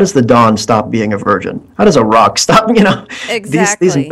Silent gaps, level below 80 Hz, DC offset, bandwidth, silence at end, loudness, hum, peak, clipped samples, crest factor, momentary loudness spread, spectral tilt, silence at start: none; -42 dBFS; under 0.1%; 14 kHz; 0 s; -10 LUFS; none; 0 dBFS; 0.5%; 10 dB; 9 LU; -4.5 dB/octave; 0 s